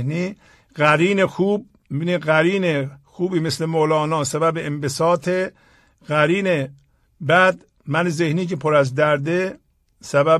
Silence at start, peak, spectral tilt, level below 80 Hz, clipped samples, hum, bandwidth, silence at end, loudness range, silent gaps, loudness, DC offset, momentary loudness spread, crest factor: 0 s; -2 dBFS; -5.5 dB/octave; -58 dBFS; under 0.1%; none; 13.5 kHz; 0 s; 2 LU; none; -20 LUFS; under 0.1%; 11 LU; 18 dB